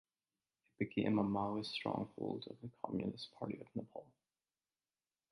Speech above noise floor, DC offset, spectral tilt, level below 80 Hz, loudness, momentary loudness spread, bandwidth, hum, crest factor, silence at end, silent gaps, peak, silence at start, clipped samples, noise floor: over 49 dB; under 0.1%; -7.5 dB/octave; -72 dBFS; -41 LUFS; 12 LU; 11 kHz; none; 20 dB; 1.3 s; none; -22 dBFS; 0.8 s; under 0.1%; under -90 dBFS